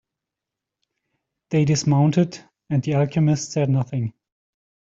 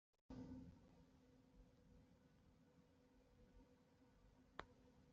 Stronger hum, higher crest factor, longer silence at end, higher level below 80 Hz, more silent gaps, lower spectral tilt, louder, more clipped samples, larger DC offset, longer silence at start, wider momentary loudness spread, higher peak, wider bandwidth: neither; second, 16 dB vs 32 dB; first, 0.8 s vs 0 s; first, -58 dBFS vs -76 dBFS; second, none vs 0.21-0.29 s; about the same, -6.5 dB/octave vs -5.5 dB/octave; first, -21 LUFS vs -61 LUFS; neither; neither; first, 1.5 s vs 0.15 s; first, 9 LU vs 5 LU; first, -6 dBFS vs -34 dBFS; about the same, 7.8 kHz vs 7.2 kHz